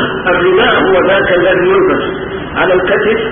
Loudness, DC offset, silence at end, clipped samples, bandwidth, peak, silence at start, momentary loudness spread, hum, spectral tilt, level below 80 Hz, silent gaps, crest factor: -10 LUFS; under 0.1%; 0 s; under 0.1%; 3.7 kHz; 0 dBFS; 0 s; 7 LU; none; -10.5 dB/octave; -36 dBFS; none; 10 dB